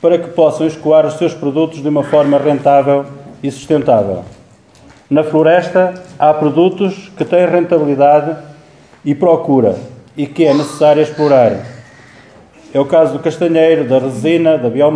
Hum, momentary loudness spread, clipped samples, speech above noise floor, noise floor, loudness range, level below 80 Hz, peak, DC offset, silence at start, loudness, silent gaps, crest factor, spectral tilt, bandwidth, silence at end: none; 12 LU; under 0.1%; 32 dB; -43 dBFS; 2 LU; -56 dBFS; 0 dBFS; under 0.1%; 0 s; -12 LUFS; none; 12 dB; -7 dB/octave; 11 kHz; 0 s